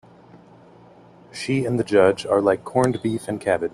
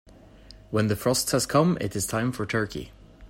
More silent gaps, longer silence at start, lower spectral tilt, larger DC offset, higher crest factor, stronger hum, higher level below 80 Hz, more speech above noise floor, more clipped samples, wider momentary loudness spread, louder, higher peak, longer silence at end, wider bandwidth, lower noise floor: neither; second, 0.35 s vs 0.5 s; first, -6 dB/octave vs -4.5 dB/octave; neither; about the same, 20 dB vs 20 dB; neither; second, -58 dBFS vs -50 dBFS; first, 28 dB vs 24 dB; neither; about the same, 8 LU vs 10 LU; first, -21 LUFS vs -25 LUFS; first, -2 dBFS vs -8 dBFS; about the same, 0.05 s vs 0 s; second, 13 kHz vs 16 kHz; about the same, -49 dBFS vs -49 dBFS